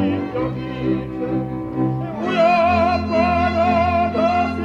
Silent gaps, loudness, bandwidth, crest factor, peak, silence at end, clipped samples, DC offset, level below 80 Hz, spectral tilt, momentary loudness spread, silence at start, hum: none; -19 LUFS; 7.4 kHz; 12 dB; -6 dBFS; 0 s; under 0.1%; under 0.1%; -38 dBFS; -7.5 dB/octave; 8 LU; 0 s; none